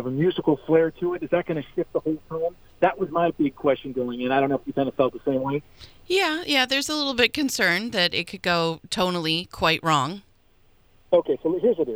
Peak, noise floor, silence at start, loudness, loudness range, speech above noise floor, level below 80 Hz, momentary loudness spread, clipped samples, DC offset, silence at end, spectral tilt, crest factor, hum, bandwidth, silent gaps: -2 dBFS; -57 dBFS; 0 s; -23 LUFS; 3 LU; 34 dB; -56 dBFS; 7 LU; under 0.1%; under 0.1%; 0 s; -4.5 dB/octave; 22 dB; none; over 20 kHz; none